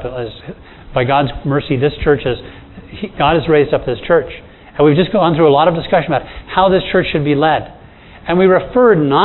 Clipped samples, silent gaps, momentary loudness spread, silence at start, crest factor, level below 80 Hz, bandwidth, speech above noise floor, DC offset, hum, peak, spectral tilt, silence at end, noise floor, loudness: under 0.1%; none; 17 LU; 0 s; 14 dB; -36 dBFS; 4.2 kHz; 25 dB; under 0.1%; none; 0 dBFS; -10 dB/octave; 0 s; -38 dBFS; -14 LUFS